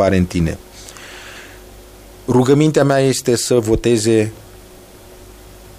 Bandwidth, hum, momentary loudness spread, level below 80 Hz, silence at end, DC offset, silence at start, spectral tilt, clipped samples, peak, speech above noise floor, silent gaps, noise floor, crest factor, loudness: 15.5 kHz; none; 22 LU; -38 dBFS; 0.55 s; under 0.1%; 0 s; -5.5 dB/octave; under 0.1%; 0 dBFS; 26 dB; none; -40 dBFS; 16 dB; -15 LUFS